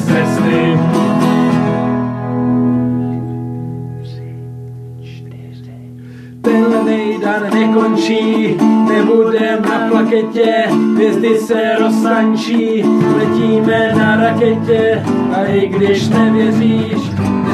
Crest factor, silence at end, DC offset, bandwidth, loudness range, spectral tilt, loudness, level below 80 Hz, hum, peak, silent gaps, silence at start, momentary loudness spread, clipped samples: 12 dB; 0 s; under 0.1%; 13 kHz; 7 LU; -7 dB/octave; -13 LUFS; -50 dBFS; none; 0 dBFS; none; 0 s; 17 LU; under 0.1%